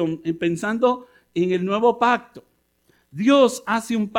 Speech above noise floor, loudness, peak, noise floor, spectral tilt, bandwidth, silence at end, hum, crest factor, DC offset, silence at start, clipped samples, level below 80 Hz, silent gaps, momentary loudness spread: 43 dB; -21 LUFS; -4 dBFS; -63 dBFS; -5.5 dB/octave; 16 kHz; 0 s; none; 16 dB; under 0.1%; 0 s; under 0.1%; -64 dBFS; none; 8 LU